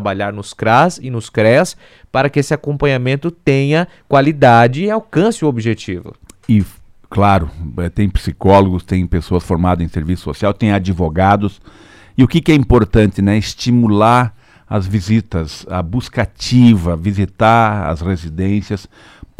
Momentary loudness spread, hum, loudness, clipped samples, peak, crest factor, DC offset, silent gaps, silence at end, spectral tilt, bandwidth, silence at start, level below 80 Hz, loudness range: 11 LU; none; -14 LUFS; under 0.1%; 0 dBFS; 14 dB; under 0.1%; none; 0.6 s; -7 dB/octave; 14 kHz; 0 s; -32 dBFS; 3 LU